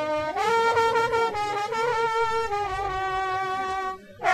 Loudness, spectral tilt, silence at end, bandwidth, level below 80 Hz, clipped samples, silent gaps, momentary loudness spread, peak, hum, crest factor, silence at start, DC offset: -25 LUFS; -3.5 dB/octave; 0 s; 13.5 kHz; -50 dBFS; under 0.1%; none; 7 LU; -8 dBFS; none; 16 dB; 0 s; under 0.1%